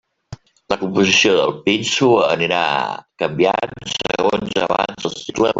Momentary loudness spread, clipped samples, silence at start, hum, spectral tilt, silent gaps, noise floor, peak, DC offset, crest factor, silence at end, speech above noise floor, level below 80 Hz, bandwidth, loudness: 11 LU; under 0.1%; 0.3 s; none; -3.5 dB/octave; none; -39 dBFS; -2 dBFS; under 0.1%; 16 dB; 0 s; 22 dB; -52 dBFS; 8 kHz; -17 LUFS